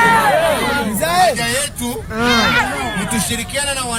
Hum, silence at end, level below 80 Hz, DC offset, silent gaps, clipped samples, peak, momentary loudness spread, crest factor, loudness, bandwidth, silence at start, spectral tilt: none; 0 s; -36 dBFS; under 0.1%; none; under 0.1%; 0 dBFS; 7 LU; 16 dB; -16 LUFS; 17.5 kHz; 0 s; -3 dB/octave